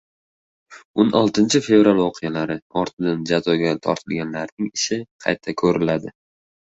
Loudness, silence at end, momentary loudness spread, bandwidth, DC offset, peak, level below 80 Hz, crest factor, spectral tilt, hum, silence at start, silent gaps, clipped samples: -20 LUFS; 0.65 s; 11 LU; 8.2 kHz; under 0.1%; -2 dBFS; -56 dBFS; 18 dB; -5 dB/octave; none; 0.7 s; 0.85-0.94 s, 2.62-2.70 s, 2.93-2.97 s, 4.52-4.57 s, 5.11-5.19 s; under 0.1%